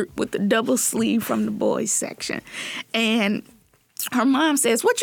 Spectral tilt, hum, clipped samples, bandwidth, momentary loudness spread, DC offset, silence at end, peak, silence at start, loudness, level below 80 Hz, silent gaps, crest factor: -3 dB/octave; none; under 0.1%; 19.5 kHz; 11 LU; under 0.1%; 0 s; -8 dBFS; 0 s; -22 LUFS; -62 dBFS; none; 14 dB